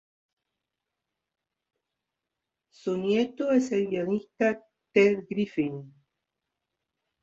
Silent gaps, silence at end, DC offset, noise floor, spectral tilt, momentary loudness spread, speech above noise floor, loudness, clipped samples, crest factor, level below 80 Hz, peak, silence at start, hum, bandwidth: none; 1.35 s; under 0.1%; -87 dBFS; -6.5 dB/octave; 10 LU; 61 dB; -27 LUFS; under 0.1%; 20 dB; -72 dBFS; -10 dBFS; 2.85 s; none; 7.8 kHz